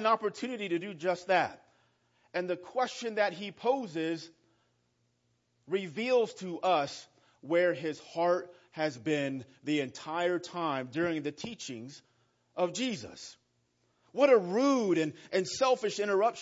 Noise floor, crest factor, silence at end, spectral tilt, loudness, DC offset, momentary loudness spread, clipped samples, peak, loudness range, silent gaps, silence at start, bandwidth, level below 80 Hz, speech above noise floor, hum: -75 dBFS; 20 dB; 0 s; -4.5 dB/octave; -32 LUFS; under 0.1%; 12 LU; under 0.1%; -12 dBFS; 5 LU; none; 0 s; 8 kHz; -80 dBFS; 44 dB; none